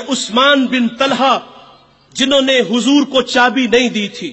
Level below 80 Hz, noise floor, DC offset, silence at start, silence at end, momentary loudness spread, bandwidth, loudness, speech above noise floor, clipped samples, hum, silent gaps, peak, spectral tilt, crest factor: -54 dBFS; -45 dBFS; under 0.1%; 0 s; 0 s; 6 LU; 8.4 kHz; -13 LUFS; 32 dB; under 0.1%; none; none; 0 dBFS; -3 dB/octave; 14 dB